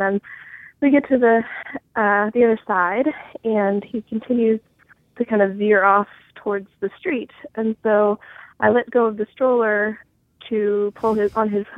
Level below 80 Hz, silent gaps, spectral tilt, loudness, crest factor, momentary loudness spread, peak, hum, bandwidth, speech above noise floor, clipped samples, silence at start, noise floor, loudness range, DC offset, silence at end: -60 dBFS; none; -8.5 dB/octave; -20 LUFS; 18 dB; 12 LU; -2 dBFS; none; 5.2 kHz; 34 dB; under 0.1%; 0 s; -54 dBFS; 2 LU; under 0.1%; 0 s